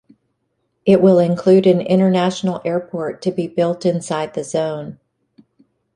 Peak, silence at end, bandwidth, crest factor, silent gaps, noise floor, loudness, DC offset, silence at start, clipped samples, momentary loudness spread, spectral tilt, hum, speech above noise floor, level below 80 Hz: -2 dBFS; 1 s; 10.5 kHz; 16 dB; none; -70 dBFS; -17 LUFS; under 0.1%; 0.85 s; under 0.1%; 10 LU; -7 dB/octave; none; 54 dB; -60 dBFS